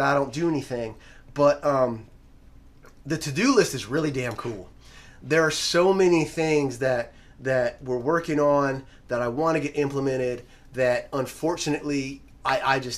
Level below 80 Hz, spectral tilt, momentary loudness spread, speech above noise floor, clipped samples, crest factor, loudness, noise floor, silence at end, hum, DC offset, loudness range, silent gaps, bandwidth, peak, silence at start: -52 dBFS; -5 dB/octave; 14 LU; 26 dB; under 0.1%; 20 dB; -24 LUFS; -50 dBFS; 0 s; none; under 0.1%; 4 LU; none; 15 kHz; -6 dBFS; 0 s